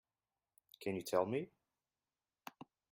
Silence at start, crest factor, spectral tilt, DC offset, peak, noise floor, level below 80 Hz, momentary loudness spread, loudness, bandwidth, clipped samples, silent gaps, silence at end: 0.8 s; 24 dB; -5.5 dB/octave; under 0.1%; -20 dBFS; under -90 dBFS; -84 dBFS; 20 LU; -40 LUFS; 16 kHz; under 0.1%; none; 1.45 s